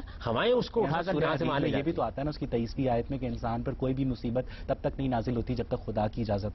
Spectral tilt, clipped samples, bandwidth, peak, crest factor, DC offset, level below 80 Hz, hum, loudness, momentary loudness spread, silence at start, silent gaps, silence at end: -8.5 dB/octave; under 0.1%; 6.2 kHz; -16 dBFS; 14 dB; under 0.1%; -44 dBFS; none; -31 LUFS; 6 LU; 0 s; none; 0 s